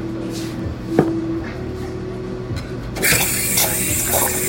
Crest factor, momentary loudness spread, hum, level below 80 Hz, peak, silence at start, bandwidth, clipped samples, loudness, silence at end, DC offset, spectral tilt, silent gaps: 20 dB; 12 LU; none; -38 dBFS; 0 dBFS; 0 s; 16.5 kHz; under 0.1%; -19 LUFS; 0 s; under 0.1%; -3 dB/octave; none